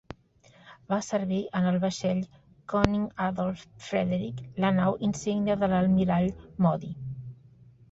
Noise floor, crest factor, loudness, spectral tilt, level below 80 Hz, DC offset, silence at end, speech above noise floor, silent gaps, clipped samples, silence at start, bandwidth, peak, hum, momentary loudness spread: -59 dBFS; 26 dB; -28 LUFS; -7 dB/octave; -50 dBFS; under 0.1%; 0.6 s; 32 dB; none; under 0.1%; 0.1 s; 8 kHz; -2 dBFS; none; 15 LU